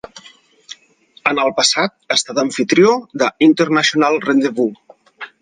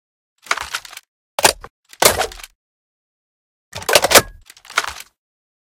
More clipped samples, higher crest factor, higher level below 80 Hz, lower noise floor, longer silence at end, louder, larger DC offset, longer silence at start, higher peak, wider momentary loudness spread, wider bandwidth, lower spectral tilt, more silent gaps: second, under 0.1% vs 0.1%; about the same, 16 dB vs 20 dB; second, -64 dBFS vs -46 dBFS; first, -51 dBFS vs -40 dBFS; second, 0.15 s vs 0.7 s; about the same, -15 LUFS vs -16 LUFS; neither; second, 0.15 s vs 0.5 s; about the same, 0 dBFS vs 0 dBFS; second, 19 LU vs 24 LU; second, 10 kHz vs 17 kHz; first, -3.5 dB/octave vs -0.5 dB/octave; second, none vs 1.08-1.38 s, 1.70-1.83 s, 2.55-3.72 s